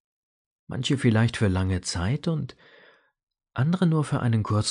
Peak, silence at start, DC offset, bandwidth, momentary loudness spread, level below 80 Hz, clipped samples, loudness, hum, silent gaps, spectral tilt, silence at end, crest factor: -10 dBFS; 0.7 s; under 0.1%; 10.5 kHz; 9 LU; -50 dBFS; under 0.1%; -25 LUFS; none; 3.23-3.27 s; -6 dB/octave; 0 s; 16 dB